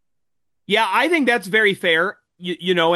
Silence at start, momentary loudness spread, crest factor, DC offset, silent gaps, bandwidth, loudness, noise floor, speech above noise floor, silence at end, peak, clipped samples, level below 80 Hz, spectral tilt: 0.7 s; 9 LU; 16 dB; under 0.1%; none; 12.5 kHz; -18 LUFS; -83 dBFS; 65 dB; 0 s; -4 dBFS; under 0.1%; -72 dBFS; -4.5 dB/octave